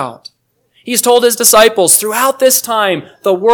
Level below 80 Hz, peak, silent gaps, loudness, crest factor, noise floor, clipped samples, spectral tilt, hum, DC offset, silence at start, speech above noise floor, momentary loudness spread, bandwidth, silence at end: -54 dBFS; 0 dBFS; none; -10 LUFS; 12 dB; -57 dBFS; 1%; -1.5 dB/octave; none; under 0.1%; 0 s; 46 dB; 9 LU; over 20 kHz; 0 s